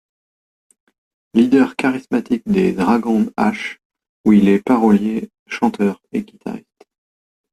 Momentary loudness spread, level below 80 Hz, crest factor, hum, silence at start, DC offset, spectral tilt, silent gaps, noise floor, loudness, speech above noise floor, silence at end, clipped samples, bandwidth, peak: 15 LU; -54 dBFS; 16 dB; none; 1.35 s; under 0.1%; -7.5 dB/octave; 3.85-3.90 s, 4.09-4.24 s, 5.39-5.46 s; under -90 dBFS; -17 LUFS; over 74 dB; 0.95 s; under 0.1%; 12.5 kHz; -2 dBFS